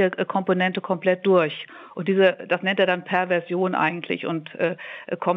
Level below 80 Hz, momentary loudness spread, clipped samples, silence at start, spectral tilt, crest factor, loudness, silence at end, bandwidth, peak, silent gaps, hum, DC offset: -78 dBFS; 10 LU; under 0.1%; 0 s; -8 dB/octave; 16 dB; -23 LUFS; 0 s; 5.6 kHz; -6 dBFS; none; none; under 0.1%